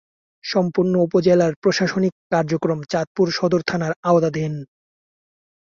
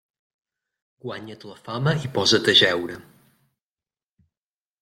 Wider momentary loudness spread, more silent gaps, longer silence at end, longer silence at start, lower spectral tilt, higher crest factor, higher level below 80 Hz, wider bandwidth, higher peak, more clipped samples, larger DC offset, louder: second, 7 LU vs 24 LU; first, 1.56-1.62 s, 2.12-2.30 s, 3.07-3.15 s, 3.96-4.03 s vs none; second, 0.95 s vs 1.8 s; second, 0.45 s vs 1.05 s; first, -6.5 dB/octave vs -4 dB/octave; about the same, 18 dB vs 22 dB; about the same, -58 dBFS vs -62 dBFS; second, 7.4 kHz vs 16 kHz; about the same, -4 dBFS vs -4 dBFS; neither; neither; about the same, -20 LUFS vs -19 LUFS